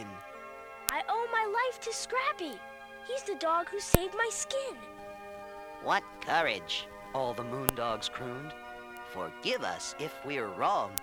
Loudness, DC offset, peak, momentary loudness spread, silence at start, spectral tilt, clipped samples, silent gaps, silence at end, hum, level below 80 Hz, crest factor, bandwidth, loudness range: -33 LUFS; under 0.1%; 0 dBFS; 16 LU; 0 s; -3 dB/octave; under 0.1%; none; 0 s; none; -50 dBFS; 34 dB; over 20 kHz; 3 LU